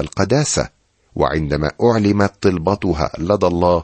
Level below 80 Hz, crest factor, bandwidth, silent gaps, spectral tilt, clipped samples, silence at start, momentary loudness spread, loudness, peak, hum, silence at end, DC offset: -36 dBFS; 16 dB; 8.8 kHz; none; -5.5 dB/octave; under 0.1%; 0 s; 6 LU; -17 LUFS; -2 dBFS; none; 0 s; under 0.1%